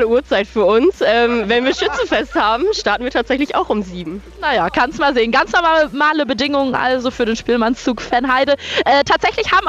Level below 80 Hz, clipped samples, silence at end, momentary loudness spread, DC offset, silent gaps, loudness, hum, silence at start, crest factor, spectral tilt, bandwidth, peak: -40 dBFS; under 0.1%; 0 s; 5 LU; under 0.1%; none; -15 LUFS; none; 0 s; 12 dB; -4 dB/octave; 9 kHz; -4 dBFS